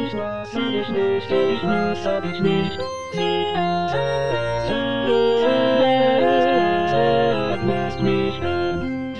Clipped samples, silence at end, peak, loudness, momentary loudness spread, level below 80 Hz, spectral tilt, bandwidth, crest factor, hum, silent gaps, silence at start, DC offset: under 0.1%; 0 s; -6 dBFS; -20 LUFS; 7 LU; -46 dBFS; -6.5 dB/octave; 10 kHz; 14 dB; none; none; 0 s; 1%